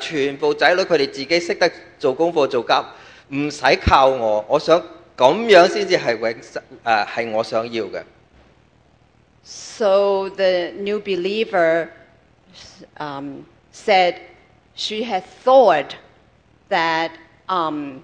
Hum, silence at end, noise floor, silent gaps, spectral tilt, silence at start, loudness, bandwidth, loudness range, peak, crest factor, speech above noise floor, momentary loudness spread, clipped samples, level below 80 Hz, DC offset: none; 0.05 s; -55 dBFS; none; -4.5 dB/octave; 0 s; -18 LUFS; 9.8 kHz; 8 LU; 0 dBFS; 20 dB; 37 dB; 18 LU; under 0.1%; -44 dBFS; under 0.1%